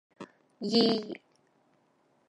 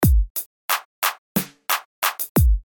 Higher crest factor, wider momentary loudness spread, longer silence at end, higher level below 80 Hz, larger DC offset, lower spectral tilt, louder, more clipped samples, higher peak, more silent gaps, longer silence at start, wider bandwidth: first, 22 dB vs 16 dB; first, 25 LU vs 7 LU; first, 1.15 s vs 0.1 s; second, -82 dBFS vs -24 dBFS; neither; about the same, -5.5 dB/octave vs -4.5 dB/octave; second, -28 LUFS vs -23 LUFS; neither; second, -12 dBFS vs -4 dBFS; second, none vs 0.30-0.35 s, 0.46-0.69 s, 0.85-1.02 s, 1.18-1.35 s, 1.85-2.02 s, 2.29-2.35 s; first, 0.2 s vs 0 s; second, 10.5 kHz vs 17.5 kHz